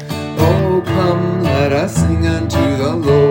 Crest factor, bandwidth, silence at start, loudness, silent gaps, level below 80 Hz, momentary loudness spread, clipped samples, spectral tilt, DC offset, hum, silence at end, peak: 14 dB; 17 kHz; 0 s; -15 LUFS; none; -36 dBFS; 3 LU; under 0.1%; -7 dB/octave; under 0.1%; none; 0 s; 0 dBFS